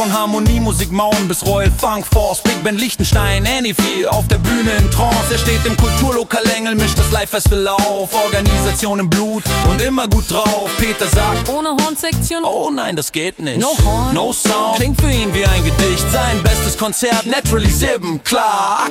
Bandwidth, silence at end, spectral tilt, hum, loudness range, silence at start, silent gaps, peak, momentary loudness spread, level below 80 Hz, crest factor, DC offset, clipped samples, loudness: 17 kHz; 0 s; -4.5 dB/octave; none; 2 LU; 0 s; none; 0 dBFS; 3 LU; -22 dBFS; 14 dB; under 0.1%; under 0.1%; -15 LUFS